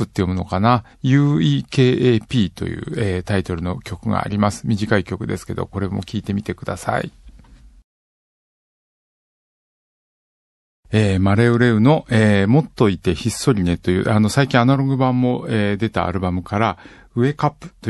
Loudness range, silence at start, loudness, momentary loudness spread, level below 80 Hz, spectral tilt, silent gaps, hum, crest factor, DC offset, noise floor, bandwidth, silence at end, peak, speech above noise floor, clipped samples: 11 LU; 0 s; -19 LUFS; 10 LU; -38 dBFS; -7 dB/octave; 7.84-10.83 s; none; 18 dB; under 0.1%; -45 dBFS; 12.5 kHz; 0 s; -2 dBFS; 27 dB; under 0.1%